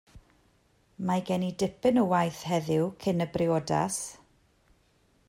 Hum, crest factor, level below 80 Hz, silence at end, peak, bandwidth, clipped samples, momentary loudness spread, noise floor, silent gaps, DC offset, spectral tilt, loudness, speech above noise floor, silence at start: none; 16 dB; -62 dBFS; 1.15 s; -12 dBFS; 16 kHz; under 0.1%; 6 LU; -66 dBFS; none; under 0.1%; -6 dB/octave; -28 LUFS; 39 dB; 0.15 s